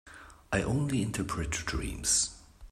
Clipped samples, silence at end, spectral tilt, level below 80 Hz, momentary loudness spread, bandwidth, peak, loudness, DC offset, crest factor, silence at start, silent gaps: under 0.1%; 0.05 s; -3.5 dB/octave; -44 dBFS; 8 LU; 16 kHz; -14 dBFS; -31 LUFS; under 0.1%; 20 dB; 0.05 s; none